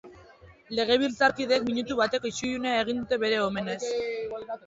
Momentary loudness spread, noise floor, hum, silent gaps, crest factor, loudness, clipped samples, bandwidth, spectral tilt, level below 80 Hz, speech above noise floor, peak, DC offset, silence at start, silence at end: 8 LU; -53 dBFS; none; none; 18 dB; -27 LUFS; under 0.1%; 8 kHz; -3.5 dB/octave; -60 dBFS; 26 dB; -10 dBFS; under 0.1%; 0.05 s; 0.1 s